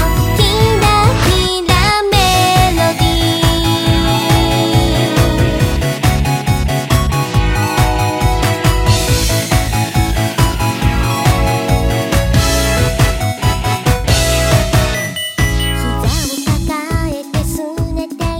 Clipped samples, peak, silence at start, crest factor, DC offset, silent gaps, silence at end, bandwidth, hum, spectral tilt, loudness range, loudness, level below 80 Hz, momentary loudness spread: under 0.1%; 0 dBFS; 0 s; 12 dB; under 0.1%; none; 0 s; 17 kHz; none; -4.5 dB/octave; 3 LU; -13 LUFS; -20 dBFS; 6 LU